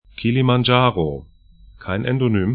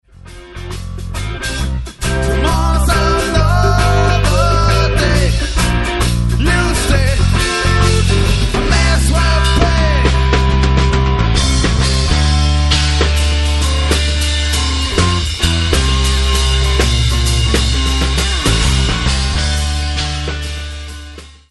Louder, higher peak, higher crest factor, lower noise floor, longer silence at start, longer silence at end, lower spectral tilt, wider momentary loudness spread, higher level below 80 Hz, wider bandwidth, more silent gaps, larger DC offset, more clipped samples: second, -19 LUFS vs -14 LUFS; about the same, 0 dBFS vs 0 dBFS; first, 20 dB vs 12 dB; first, -46 dBFS vs -35 dBFS; about the same, 0.2 s vs 0.25 s; second, 0 s vs 0.2 s; first, -12 dB/octave vs -4.5 dB/octave; first, 13 LU vs 8 LU; second, -44 dBFS vs -16 dBFS; second, 5 kHz vs 12 kHz; neither; second, under 0.1% vs 0.1%; neither